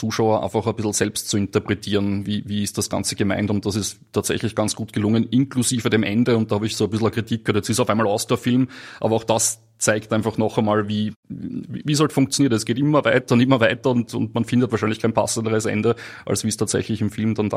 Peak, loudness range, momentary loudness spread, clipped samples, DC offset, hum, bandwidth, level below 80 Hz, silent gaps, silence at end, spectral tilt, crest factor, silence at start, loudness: -2 dBFS; 3 LU; 7 LU; under 0.1%; under 0.1%; none; 15.5 kHz; -56 dBFS; 11.16-11.23 s; 0 s; -5 dB/octave; 18 dB; 0 s; -21 LUFS